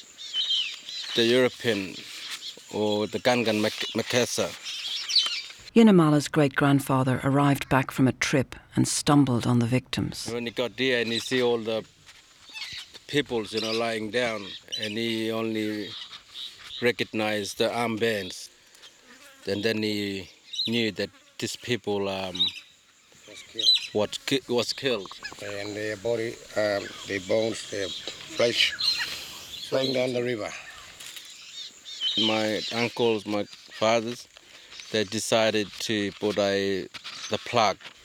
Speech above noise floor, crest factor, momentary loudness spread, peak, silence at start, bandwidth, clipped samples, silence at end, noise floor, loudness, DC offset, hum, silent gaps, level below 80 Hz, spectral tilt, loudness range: 31 dB; 22 dB; 15 LU; -6 dBFS; 0 s; 18.5 kHz; under 0.1%; 0.15 s; -57 dBFS; -26 LUFS; under 0.1%; none; none; -60 dBFS; -4.5 dB/octave; 7 LU